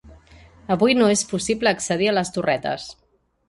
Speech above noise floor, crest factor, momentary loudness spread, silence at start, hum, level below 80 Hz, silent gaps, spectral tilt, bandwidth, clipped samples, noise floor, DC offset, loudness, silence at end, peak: 28 dB; 18 dB; 13 LU; 0.05 s; none; -52 dBFS; none; -4 dB/octave; 11.5 kHz; under 0.1%; -49 dBFS; under 0.1%; -21 LUFS; 0.55 s; -4 dBFS